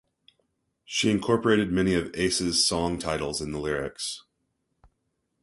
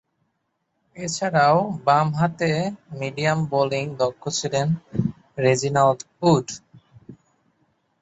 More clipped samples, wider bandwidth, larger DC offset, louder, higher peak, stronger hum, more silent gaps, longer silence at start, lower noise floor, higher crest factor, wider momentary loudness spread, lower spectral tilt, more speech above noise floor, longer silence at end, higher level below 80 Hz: neither; first, 11.5 kHz vs 8.2 kHz; neither; second, -26 LUFS vs -22 LUFS; about the same, -6 dBFS vs -4 dBFS; neither; neither; about the same, 0.9 s vs 0.95 s; about the same, -77 dBFS vs -74 dBFS; about the same, 22 dB vs 18 dB; about the same, 9 LU vs 11 LU; second, -4 dB/octave vs -5.5 dB/octave; about the same, 51 dB vs 53 dB; first, 1.25 s vs 0.9 s; first, -50 dBFS vs -58 dBFS